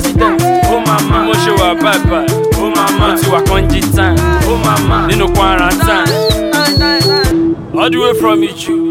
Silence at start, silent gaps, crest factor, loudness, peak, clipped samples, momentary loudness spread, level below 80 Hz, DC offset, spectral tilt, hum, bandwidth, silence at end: 0 s; none; 10 dB; -11 LUFS; 0 dBFS; under 0.1%; 3 LU; -20 dBFS; under 0.1%; -5 dB/octave; none; 17 kHz; 0 s